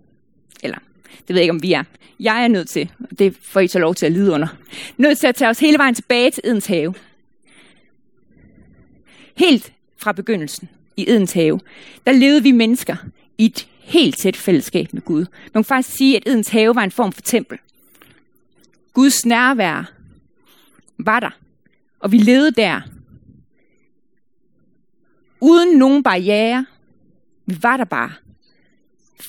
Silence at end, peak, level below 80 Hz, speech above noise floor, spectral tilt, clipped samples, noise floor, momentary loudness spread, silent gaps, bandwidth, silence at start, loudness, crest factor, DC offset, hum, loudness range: 0 s; 0 dBFS; -62 dBFS; 53 dB; -4.5 dB/octave; under 0.1%; -68 dBFS; 17 LU; none; 17.5 kHz; 0.65 s; -15 LUFS; 18 dB; 0.1%; none; 6 LU